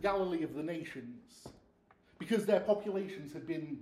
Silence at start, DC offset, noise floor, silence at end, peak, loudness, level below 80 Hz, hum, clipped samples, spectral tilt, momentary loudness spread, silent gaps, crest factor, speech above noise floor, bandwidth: 0 s; under 0.1%; -67 dBFS; 0 s; -16 dBFS; -36 LUFS; -68 dBFS; none; under 0.1%; -6.5 dB/octave; 21 LU; none; 20 dB; 32 dB; 14.5 kHz